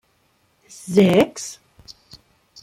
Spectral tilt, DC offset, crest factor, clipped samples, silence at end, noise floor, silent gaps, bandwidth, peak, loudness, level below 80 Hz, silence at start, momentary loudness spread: -5.5 dB/octave; under 0.1%; 20 dB; under 0.1%; 1.1 s; -63 dBFS; none; 16 kHz; -2 dBFS; -17 LUFS; -58 dBFS; 0.85 s; 24 LU